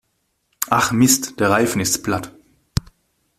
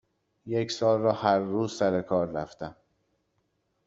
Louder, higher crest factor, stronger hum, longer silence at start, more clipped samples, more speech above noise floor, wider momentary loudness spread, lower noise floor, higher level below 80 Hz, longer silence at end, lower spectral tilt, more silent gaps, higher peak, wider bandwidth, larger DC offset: first, -18 LUFS vs -27 LUFS; about the same, 20 dB vs 20 dB; neither; first, 0.6 s vs 0.45 s; neither; first, 52 dB vs 48 dB; about the same, 12 LU vs 13 LU; second, -69 dBFS vs -75 dBFS; first, -42 dBFS vs -66 dBFS; about the same, 1.1 s vs 1.15 s; second, -3.5 dB/octave vs -6 dB/octave; neither; first, 0 dBFS vs -8 dBFS; first, 16 kHz vs 8 kHz; neither